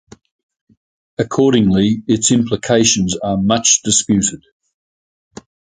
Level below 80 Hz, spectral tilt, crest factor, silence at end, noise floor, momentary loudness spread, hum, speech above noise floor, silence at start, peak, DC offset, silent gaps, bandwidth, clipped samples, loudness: -44 dBFS; -4 dB/octave; 16 dB; 1.3 s; under -90 dBFS; 7 LU; none; over 76 dB; 1.2 s; 0 dBFS; under 0.1%; none; 10 kHz; under 0.1%; -14 LUFS